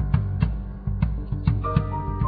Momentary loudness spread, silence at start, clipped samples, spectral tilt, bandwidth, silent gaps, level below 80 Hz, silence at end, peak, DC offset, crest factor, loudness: 5 LU; 0 s; under 0.1%; -12 dB/octave; 4.9 kHz; none; -30 dBFS; 0 s; -6 dBFS; under 0.1%; 18 dB; -26 LUFS